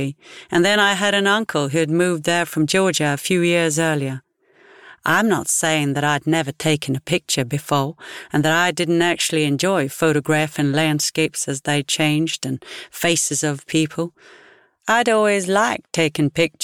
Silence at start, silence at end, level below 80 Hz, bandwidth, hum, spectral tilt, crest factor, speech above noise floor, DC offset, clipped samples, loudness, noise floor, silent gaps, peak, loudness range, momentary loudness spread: 0 s; 0 s; -60 dBFS; 19 kHz; none; -4 dB/octave; 16 dB; 33 dB; 0.1%; under 0.1%; -19 LUFS; -52 dBFS; none; -4 dBFS; 2 LU; 7 LU